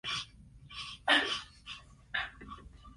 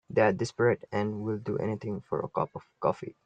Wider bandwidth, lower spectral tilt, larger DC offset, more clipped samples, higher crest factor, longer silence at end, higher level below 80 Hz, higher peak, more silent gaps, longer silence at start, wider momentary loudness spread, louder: first, 11.5 kHz vs 9.2 kHz; second, -2 dB/octave vs -7 dB/octave; neither; neither; about the same, 24 dB vs 20 dB; about the same, 0.05 s vs 0.15 s; first, -58 dBFS vs -66 dBFS; about the same, -12 dBFS vs -10 dBFS; neither; about the same, 0.05 s vs 0.1 s; first, 22 LU vs 8 LU; second, -33 LUFS vs -30 LUFS